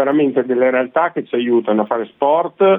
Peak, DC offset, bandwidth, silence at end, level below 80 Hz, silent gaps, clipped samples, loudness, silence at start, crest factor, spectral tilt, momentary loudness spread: -4 dBFS; under 0.1%; 3.9 kHz; 0 s; -70 dBFS; none; under 0.1%; -16 LUFS; 0 s; 12 dB; -10 dB/octave; 4 LU